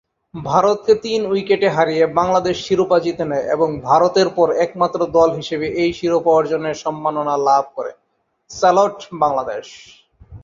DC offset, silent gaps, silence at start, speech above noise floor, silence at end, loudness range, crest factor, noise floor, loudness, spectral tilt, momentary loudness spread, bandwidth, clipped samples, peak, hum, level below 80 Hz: under 0.1%; none; 0.35 s; 49 dB; 0.05 s; 3 LU; 16 dB; -65 dBFS; -17 LUFS; -5.5 dB/octave; 8 LU; 7.6 kHz; under 0.1%; -2 dBFS; none; -52 dBFS